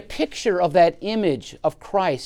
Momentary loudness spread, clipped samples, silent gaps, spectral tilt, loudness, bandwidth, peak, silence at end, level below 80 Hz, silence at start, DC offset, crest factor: 10 LU; under 0.1%; none; -5.5 dB/octave; -21 LUFS; 13.5 kHz; -4 dBFS; 0 s; -50 dBFS; 0 s; under 0.1%; 16 dB